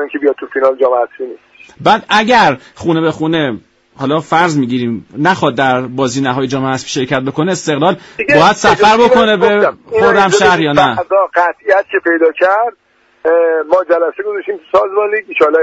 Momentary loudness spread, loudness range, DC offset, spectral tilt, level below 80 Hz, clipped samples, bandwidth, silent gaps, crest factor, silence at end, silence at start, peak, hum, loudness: 9 LU; 5 LU; under 0.1%; -5 dB/octave; -48 dBFS; under 0.1%; 8.4 kHz; none; 12 dB; 0 s; 0 s; 0 dBFS; none; -12 LUFS